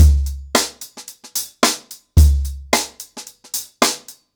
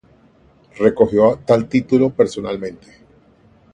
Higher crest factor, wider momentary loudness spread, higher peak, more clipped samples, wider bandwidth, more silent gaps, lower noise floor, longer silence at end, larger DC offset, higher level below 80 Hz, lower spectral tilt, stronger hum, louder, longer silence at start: about the same, 14 dB vs 18 dB; first, 19 LU vs 12 LU; second, -4 dBFS vs 0 dBFS; neither; first, over 20 kHz vs 9.8 kHz; neither; second, -39 dBFS vs -52 dBFS; second, 0.25 s vs 1 s; neither; first, -20 dBFS vs -50 dBFS; second, -4 dB/octave vs -7.5 dB/octave; neither; second, -19 LUFS vs -16 LUFS; second, 0 s vs 0.75 s